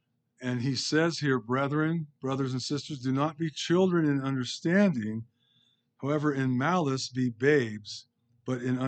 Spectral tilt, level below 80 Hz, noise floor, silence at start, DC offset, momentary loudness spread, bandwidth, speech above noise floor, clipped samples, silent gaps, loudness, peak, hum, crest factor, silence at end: -6 dB/octave; -76 dBFS; -69 dBFS; 0.4 s; under 0.1%; 11 LU; 9 kHz; 41 dB; under 0.1%; none; -29 LUFS; -10 dBFS; none; 18 dB; 0 s